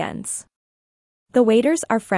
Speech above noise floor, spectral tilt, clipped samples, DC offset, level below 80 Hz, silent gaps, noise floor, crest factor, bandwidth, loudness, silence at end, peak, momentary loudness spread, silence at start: over 71 dB; -4.5 dB/octave; under 0.1%; under 0.1%; -62 dBFS; 0.56-1.26 s; under -90 dBFS; 16 dB; 12 kHz; -19 LUFS; 0 s; -4 dBFS; 12 LU; 0 s